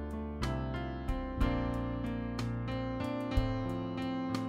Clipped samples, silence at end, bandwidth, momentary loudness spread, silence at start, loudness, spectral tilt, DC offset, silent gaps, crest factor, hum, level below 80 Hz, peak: under 0.1%; 0 s; 15.5 kHz; 4 LU; 0 s; -36 LUFS; -7.5 dB/octave; under 0.1%; none; 18 dB; none; -40 dBFS; -16 dBFS